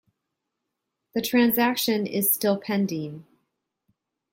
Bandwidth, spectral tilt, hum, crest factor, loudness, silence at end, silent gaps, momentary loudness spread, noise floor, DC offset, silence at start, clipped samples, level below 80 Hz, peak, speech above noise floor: 16.5 kHz; -4 dB/octave; none; 20 dB; -23 LUFS; 1.1 s; none; 11 LU; -82 dBFS; under 0.1%; 1.15 s; under 0.1%; -70 dBFS; -8 dBFS; 59 dB